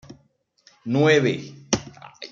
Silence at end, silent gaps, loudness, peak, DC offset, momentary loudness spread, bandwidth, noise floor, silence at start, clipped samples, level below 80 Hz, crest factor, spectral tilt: 0.05 s; none; -22 LUFS; -6 dBFS; under 0.1%; 22 LU; 7.6 kHz; -64 dBFS; 0.1 s; under 0.1%; -56 dBFS; 18 dB; -5 dB/octave